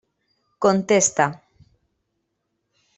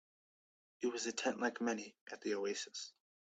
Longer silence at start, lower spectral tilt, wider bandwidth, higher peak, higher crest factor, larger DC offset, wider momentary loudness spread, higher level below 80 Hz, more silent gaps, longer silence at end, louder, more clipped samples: second, 0.6 s vs 0.8 s; about the same, -3.5 dB/octave vs -2.5 dB/octave; about the same, 8.4 kHz vs 9 kHz; first, -4 dBFS vs -22 dBFS; about the same, 22 dB vs 20 dB; neither; second, 6 LU vs 10 LU; first, -64 dBFS vs -86 dBFS; second, none vs 2.01-2.06 s; first, 1.6 s vs 0.35 s; first, -19 LUFS vs -41 LUFS; neither